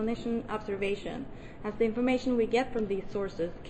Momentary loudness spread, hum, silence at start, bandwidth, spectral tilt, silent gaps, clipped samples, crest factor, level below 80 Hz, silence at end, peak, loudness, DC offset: 12 LU; none; 0 s; 8.8 kHz; -6.5 dB/octave; none; under 0.1%; 16 dB; -48 dBFS; 0 s; -16 dBFS; -31 LUFS; under 0.1%